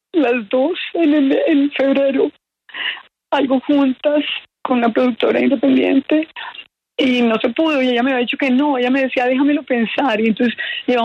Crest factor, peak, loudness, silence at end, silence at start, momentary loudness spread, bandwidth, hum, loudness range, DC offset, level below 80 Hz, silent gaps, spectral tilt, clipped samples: 12 dB; -4 dBFS; -16 LUFS; 0 s; 0.15 s; 8 LU; 6.6 kHz; none; 2 LU; under 0.1%; -64 dBFS; none; -6 dB/octave; under 0.1%